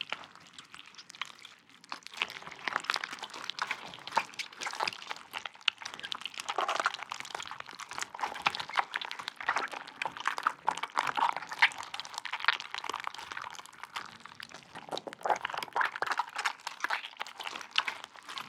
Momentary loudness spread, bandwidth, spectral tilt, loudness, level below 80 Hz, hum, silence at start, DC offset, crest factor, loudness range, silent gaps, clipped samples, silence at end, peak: 14 LU; 17.5 kHz; -0.5 dB/octave; -35 LUFS; -82 dBFS; none; 0 s; under 0.1%; 32 dB; 6 LU; none; under 0.1%; 0 s; -4 dBFS